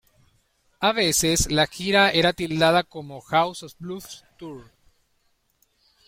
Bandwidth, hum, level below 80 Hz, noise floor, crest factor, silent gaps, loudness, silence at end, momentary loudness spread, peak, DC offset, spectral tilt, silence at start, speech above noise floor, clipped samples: 16.5 kHz; none; -46 dBFS; -68 dBFS; 20 dB; none; -21 LUFS; 1.45 s; 21 LU; -4 dBFS; under 0.1%; -3 dB/octave; 0.8 s; 45 dB; under 0.1%